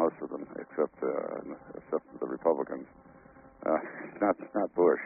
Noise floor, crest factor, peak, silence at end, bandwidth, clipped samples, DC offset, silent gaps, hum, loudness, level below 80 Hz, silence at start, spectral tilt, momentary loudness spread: -55 dBFS; 18 dB; -12 dBFS; 0 s; 2.7 kHz; under 0.1%; under 0.1%; none; none; -33 LUFS; -70 dBFS; 0 s; -1.5 dB/octave; 12 LU